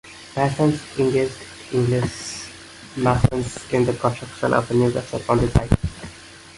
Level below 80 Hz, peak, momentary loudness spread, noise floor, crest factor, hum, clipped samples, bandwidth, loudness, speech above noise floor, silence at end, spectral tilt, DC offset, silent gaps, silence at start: -36 dBFS; -2 dBFS; 16 LU; -42 dBFS; 20 dB; none; under 0.1%; 11.5 kHz; -22 LUFS; 22 dB; 0.05 s; -6.5 dB/octave; under 0.1%; none; 0.05 s